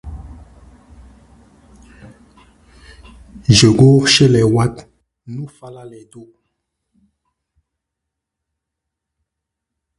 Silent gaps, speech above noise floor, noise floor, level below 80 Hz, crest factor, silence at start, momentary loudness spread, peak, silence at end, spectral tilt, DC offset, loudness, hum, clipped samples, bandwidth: none; 67 dB; -80 dBFS; -42 dBFS; 18 dB; 0.05 s; 27 LU; 0 dBFS; 3.8 s; -5 dB/octave; under 0.1%; -11 LUFS; none; under 0.1%; 11.5 kHz